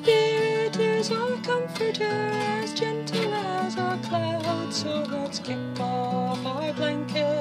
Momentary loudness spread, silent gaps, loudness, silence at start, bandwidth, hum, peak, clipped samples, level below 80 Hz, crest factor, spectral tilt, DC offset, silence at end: 5 LU; none; -27 LUFS; 0 s; 15 kHz; none; -8 dBFS; under 0.1%; -74 dBFS; 18 dB; -5 dB/octave; under 0.1%; 0 s